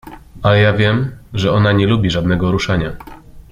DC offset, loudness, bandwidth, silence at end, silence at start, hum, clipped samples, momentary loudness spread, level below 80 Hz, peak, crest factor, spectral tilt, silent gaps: under 0.1%; -15 LUFS; 7.4 kHz; 0.1 s; 0.05 s; none; under 0.1%; 8 LU; -36 dBFS; -2 dBFS; 14 dB; -7 dB/octave; none